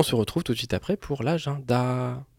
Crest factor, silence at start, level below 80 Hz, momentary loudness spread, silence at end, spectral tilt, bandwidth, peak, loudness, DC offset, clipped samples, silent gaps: 20 dB; 0 s; -50 dBFS; 4 LU; 0.15 s; -6 dB/octave; 16.5 kHz; -6 dBFS; -27 LUFS; under 0.1%; under 0.1%; none